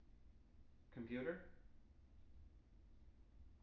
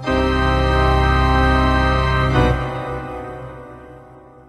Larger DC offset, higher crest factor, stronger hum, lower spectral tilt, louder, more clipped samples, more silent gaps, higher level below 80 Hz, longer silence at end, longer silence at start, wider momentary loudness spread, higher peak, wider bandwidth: neither; first, 24 dB vs 14 dB; neither; about the same, -6 dB/octave vs -7 dB/octave; second, -50 LUFS vs -17 LUFS; neither; neither; second, -68 dBFS vs -22 dBFS; second, 0 s vs 0.3 s; about the same, 0 s vs 0 s; first, 22 LU vs 17 LU; second, -32 dBFS vs -2 dBFS; second, 5.8 kHz vs 11.5 kHz